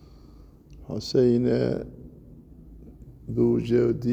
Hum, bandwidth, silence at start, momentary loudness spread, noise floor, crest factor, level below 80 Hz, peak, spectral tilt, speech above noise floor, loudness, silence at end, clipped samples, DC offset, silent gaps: none; 8.2 kHz; 0.7 s; 19 LU; -49 dBFS; 16 dB; -48 dBFS; -10 dBFS; -8 dB/octave; 27 dB; -24 LUFS; 0 s; under 0.1%; under 0.1%; none